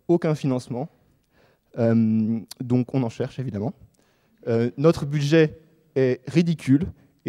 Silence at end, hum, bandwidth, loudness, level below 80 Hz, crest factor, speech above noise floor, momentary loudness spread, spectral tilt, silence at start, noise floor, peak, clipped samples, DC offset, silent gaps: 0 s; none; 13 kHz; -23 LUFS; -54 dBFS; 18 dB; 41 dB; 13 LU; -8 dB/octave; 0.1 s; -63 dBFS; -6 dBFS; under 0.1%; under 0.1%; none